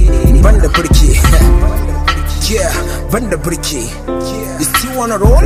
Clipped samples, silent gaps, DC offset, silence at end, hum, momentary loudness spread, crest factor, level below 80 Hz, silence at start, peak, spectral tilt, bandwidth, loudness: 0.2%; none; under 0.1%; 0 s; none; 9 LU; 10 dB; -12 dBFS; 0 s; 0 dBFS; -5 dB/octave; 16 kHz; -12 LUFS